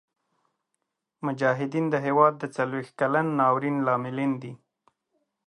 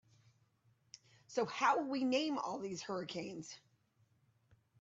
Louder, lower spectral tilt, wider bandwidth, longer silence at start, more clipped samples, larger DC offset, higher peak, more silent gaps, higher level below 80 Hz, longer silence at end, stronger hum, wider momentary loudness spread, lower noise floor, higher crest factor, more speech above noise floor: first, -25 LUFS vs -38 LUFS; first, -8 dB/octave vs -4 dB/octave; first, 10.5 kHz vs 8 kHz; about the same, 1.2 s vs 1.3 s; neither; neither; first, -6 dBFS vs -18 dBFS; neither; first, -78 dBFS vs -84 dBFS; second, 0.9 s vs 1.25 s; neither; second, 10 LU vs 18 LU; first, -81 dBFS vs -75 dBFS; about the same, 22 dB vs 22 dB; first, 56 dB vs 37 dB